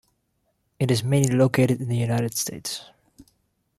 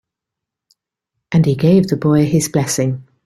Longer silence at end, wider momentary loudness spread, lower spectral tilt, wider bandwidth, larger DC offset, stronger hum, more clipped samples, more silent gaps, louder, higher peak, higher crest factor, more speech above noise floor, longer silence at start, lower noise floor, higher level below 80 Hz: first, 0.95 s vs 0.25 s; first, 12 LU vs 6 LU; about the same, -5.5 dB/octave vs -6.5 dB/octave; about the same, 15 kHz vs 14.5 kHz; neither; neither; neither; neither; second, -23 LUFS vs -15 LUFS; second, -6 dBFS vs -2 dBFS; about the same, 20 dB vs 16 dB; second, 50 dB vs 69 dB; second, 0.8 s vs 1.3 s; second, -72 dBFS vs -83 dBFS; second, -58 dBFS vs -50 dBFS